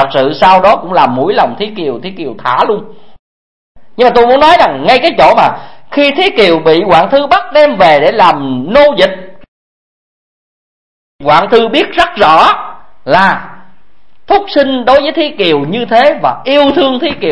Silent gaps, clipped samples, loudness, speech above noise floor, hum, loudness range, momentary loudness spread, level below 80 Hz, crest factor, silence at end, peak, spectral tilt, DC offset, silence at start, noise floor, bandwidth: 3.19-3.75 s, 9.48-11.19 s; 1%; -8 LUFS; 46 dB; none; 5 LU; 11 LU; -40 dBFS; 10 dB; 0 s; 0 dBFS; -5.5 dB/octave; 3%; 0 s; -54 dBFS; 11 kHz